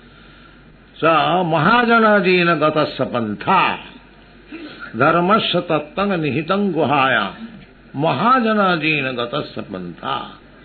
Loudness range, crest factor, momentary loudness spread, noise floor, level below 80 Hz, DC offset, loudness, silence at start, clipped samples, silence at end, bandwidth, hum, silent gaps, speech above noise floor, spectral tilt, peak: 4 LU; 16 dB; 17 LU; -45 dBFS; -52 dBFS; under 0.1%; -17 LUFS; 1 s; under 0.1%; 0.3 s; 4.6 kHz; none; none; 28 dB; -9 dB/octave; -2 dBFS